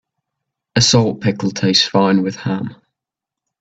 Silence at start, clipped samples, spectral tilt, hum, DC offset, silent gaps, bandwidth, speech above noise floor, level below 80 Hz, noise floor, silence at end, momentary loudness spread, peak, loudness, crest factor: 0.75 s; under 0.1%; -4.5 dB/octave; none; under 0.1%; none; 9 kHz; 69 dB; -52 dBFS; -85 dBFS; 0.85 s; 10 LU; 0 dBFS; -15 LUFS; 18 dB